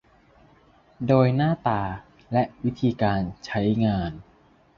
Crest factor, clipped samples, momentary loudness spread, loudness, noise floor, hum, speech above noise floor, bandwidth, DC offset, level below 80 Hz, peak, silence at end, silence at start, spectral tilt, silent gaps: 20 dB; under 0.1%; 13 LU; -24 LUFS; -57 dBFS; none; 34 dB; 7 kHz; under 0.1%; -48 dBFS; -6 dBFS; 0.55 s; 1 s; -8.5 dB/octave; none